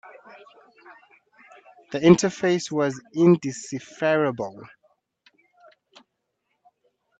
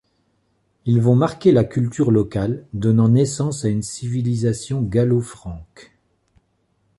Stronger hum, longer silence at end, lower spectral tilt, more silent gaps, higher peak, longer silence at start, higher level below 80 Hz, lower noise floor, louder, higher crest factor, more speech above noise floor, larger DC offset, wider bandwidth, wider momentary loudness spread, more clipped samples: neither; first, 2.55 s vs 1.15 s; second, -6 dB/octave vs -7.5 dB/octave; neither; about the same, -2 dBFS vs -4 dBFS; first, 1.9 s vs 0.85 s; second, -66 dBFS vs -46 dBFS; first, -77 dBFS vs -66 dBFS; second, -22 LUFS vs -19 LUFS; first, 24 dB vs 16 dB; first, 54 dB vs 48 dB; neither; second, 8.2 kHz vs 11.5 kHz; first, 16 LU vs 9 LU; neither